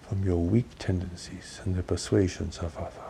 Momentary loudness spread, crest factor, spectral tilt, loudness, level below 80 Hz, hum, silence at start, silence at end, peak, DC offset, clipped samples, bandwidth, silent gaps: 12 LU; 18 dB; -6.5 dB/octave; -29 LUFS; -44 dBFS; none; 0 s; 0 s; -10 dBFS; under 0.1%; under 0.1%; 11 kHz; none